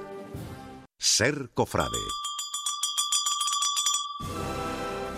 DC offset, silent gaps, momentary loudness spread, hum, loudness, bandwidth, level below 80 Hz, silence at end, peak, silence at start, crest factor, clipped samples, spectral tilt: under 0.1%; none; 17 LU; none; -27 LUFS; 15.5 kHz; -52 dBFS; 0 s; -8 dBFS; 0 s; 20 dB; under 0.1%; -1.5 dB/octave